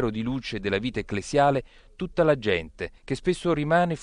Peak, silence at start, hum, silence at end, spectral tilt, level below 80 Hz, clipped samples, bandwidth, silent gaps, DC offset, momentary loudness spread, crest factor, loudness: -8 dBFS; 0 s; none; 0 s; -6 dB/octave; -46 dBFS; under 0.1%; 11 kHz; none; under 0.1%; 10 LU; 16 dB; -25 LUFS